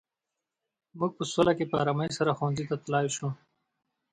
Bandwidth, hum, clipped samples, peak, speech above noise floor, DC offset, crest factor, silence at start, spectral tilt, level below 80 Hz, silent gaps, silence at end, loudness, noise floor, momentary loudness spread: 9.6 kHz; none; under 0.1%; -10 dBFS; 59 dB; under 0.1%; 22 dB; 0.95 s; -5.5 dB/octave; -64 dBFS; none; 0.75 s; -29 LUFS; -87 dBFS; 8 LU